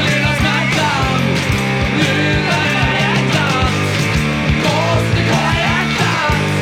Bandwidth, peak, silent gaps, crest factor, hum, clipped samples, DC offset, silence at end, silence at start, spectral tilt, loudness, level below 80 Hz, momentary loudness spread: 16.5 kHz; -2 dBFS; none; 14 dB; none; under 0.1%; under 0.1%; 0 s; 0 s; -5 dB/octave; -14 LUFS; -30 dBFS; 2 LU